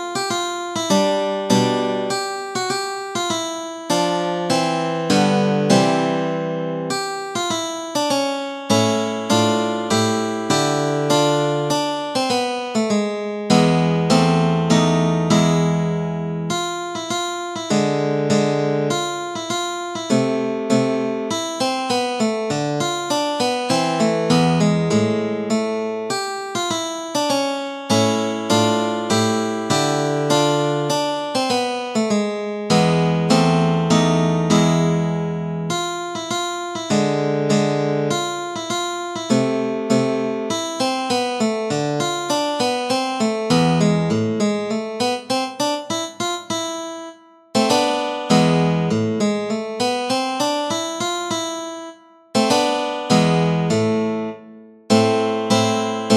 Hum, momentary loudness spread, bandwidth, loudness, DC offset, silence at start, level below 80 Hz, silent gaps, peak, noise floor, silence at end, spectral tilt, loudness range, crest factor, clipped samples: none; 8 LU; 14 kHz; -20 LUFS; under 0.1%; 0 s; -56 dBFS; none; -2 dBFS; -42 dBFS; 0 s; -5 dB/octave; 3 LU; 18 dB; under 0.1%